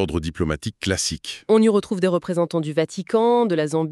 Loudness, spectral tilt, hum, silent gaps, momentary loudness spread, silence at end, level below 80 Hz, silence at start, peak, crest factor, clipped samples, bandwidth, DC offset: -21 LUFS; -5 dB/octave; none; none; 8 LU; 0 s; -44 dBFS; 0 s; -6 dBFS; 14 dB; under 0.1%; 12.5 kHz; under 0.1%